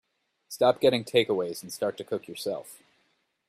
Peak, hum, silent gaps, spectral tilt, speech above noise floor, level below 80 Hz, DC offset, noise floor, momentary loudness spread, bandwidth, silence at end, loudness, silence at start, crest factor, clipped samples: -8 dBFS; none; none; -4.5 dB/octave; 45 dB; -70 dBFS; under 0.1%; -72 dBFS; 14 LU; 15.5 kHz; 0.75 s; -27 LUFS; 0.5 s; 20 dB; under 0.1%